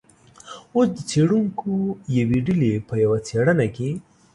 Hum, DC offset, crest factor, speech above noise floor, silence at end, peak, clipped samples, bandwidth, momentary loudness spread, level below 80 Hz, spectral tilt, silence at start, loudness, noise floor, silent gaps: none; under 0.1%; 14 dB; 24 dB; 0.35 s; -8 dBFS; under 0.1%; 11.5 kHz; 9 LU; -52 dBFS; -7 dB/octave; 0.45 s; -22 LUFS; -45 dBFS; none